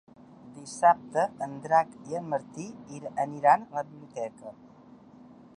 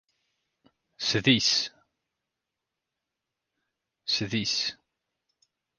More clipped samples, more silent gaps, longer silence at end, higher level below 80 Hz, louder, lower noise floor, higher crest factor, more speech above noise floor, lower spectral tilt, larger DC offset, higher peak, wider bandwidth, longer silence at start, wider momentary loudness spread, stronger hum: neither; neither; about the same, 1.05 s vs 1.05 s; second, -74 dBFS vs -66 dBFS; about the same, -28 LUFS vs -26 LUFS; second, -53 dBFS vs -86 dBFS; about the same, 22 dB vs 26 dB; second, 24 dB vs 60 dB; first, -5.5 dB/octave vs -3 dB/octave; neither; about the same, -8 dBFS vs -8 dBFS; about the same, 10.5 kHz vs 10.5 kHz; second, 0.45 s vs 1 s; first, 18 LU vs 11 LU; neither